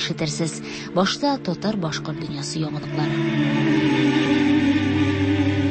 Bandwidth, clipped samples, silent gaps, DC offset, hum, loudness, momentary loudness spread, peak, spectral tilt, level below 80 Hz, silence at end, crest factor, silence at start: 8.8 kHz; under 0.1%; none; under 0.1%; none; -22 LUFS; 8 LU; -8 dBFS; -5.5 dB/octave; -52 dBFS; 0 s; 14 dB; 0 s